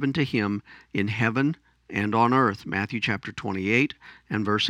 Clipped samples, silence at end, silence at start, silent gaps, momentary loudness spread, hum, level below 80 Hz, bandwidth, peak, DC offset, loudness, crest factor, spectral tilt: under 0.1%; 0 s; 0 s; none; 11 LU; none; -62 dBFS; 11 kHz; -6 dBFS; under 0.1%; -25 LUFS; 20 dB; -6 dB/octave